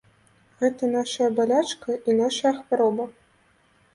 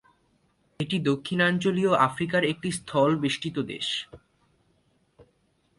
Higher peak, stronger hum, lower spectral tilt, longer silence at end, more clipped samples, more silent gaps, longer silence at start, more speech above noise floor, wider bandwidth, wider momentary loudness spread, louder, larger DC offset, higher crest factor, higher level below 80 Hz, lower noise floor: about the same, -10 dBFS vs -8 dBFS; neither; about the same, -4 dB/octave vs -5 dB/octave; first, 0.85 s vs 0.55 s; neither; neither; second, 0.6 s vs 0.8 s; second, 39 dB vs 43 dB; about the same, 11.5 kHz vs 11.5 kHz; about the same, 6 LU vs 8 LU; about the same, -24 LUFS vs -26 LUFS; neither; about the same, 16 dB vs 20 dB; second, -70 dBFS vs -62 dBFS; second, -61 dBFS vs -68 dBFS